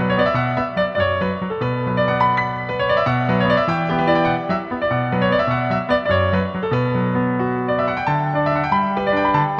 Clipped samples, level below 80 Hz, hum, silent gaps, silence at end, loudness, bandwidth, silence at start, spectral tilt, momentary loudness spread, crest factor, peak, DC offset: under 0.1%; -44 dBFS; none; none; 0 s; -19 LUFS; 7 kHz; 0 s; -8.5 dB/octave; 5 LU; 14 dB; -4 dBFS; under 0.1%